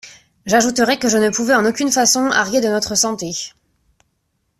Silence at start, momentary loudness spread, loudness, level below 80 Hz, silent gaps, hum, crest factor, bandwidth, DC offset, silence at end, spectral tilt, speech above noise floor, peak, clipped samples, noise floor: 0.05 s; 11 LU; -16 LUFS; -54 dBFS; none; none; 16 dB; 15 kHz; under 0.1%; 1.1 s; -2 dB/octave; 52 dB; -2 dBFS; under 0.1%; -68 dBFS